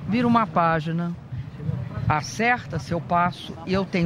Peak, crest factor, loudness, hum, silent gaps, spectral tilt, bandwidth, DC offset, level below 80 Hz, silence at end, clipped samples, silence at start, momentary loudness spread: -6 dBFS; 18 dB; -24 LUFS; none; none; -6.5 dB/octave; 12 kHz; under 0.1%; -46 dBFS; 0 s; under 0.1%; 0 s; 11 LU